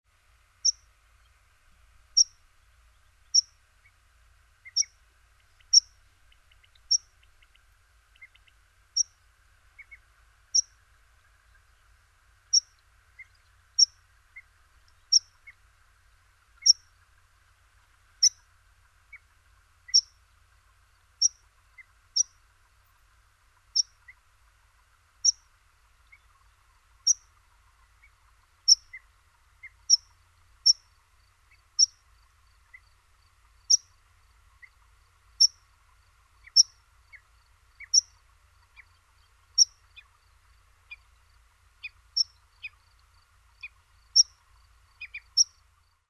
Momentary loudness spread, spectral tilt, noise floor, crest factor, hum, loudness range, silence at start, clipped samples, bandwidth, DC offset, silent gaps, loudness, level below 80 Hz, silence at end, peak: 23 LU; 5.5 dB/octave; -65 dBFS; 26 dB; none; 6 LU; 0.65 s; under 0.1%; 12.5 kHz; under 0.1%; none; -24 LUFS; -64 dBFS; 0.65 s; -6 dBFS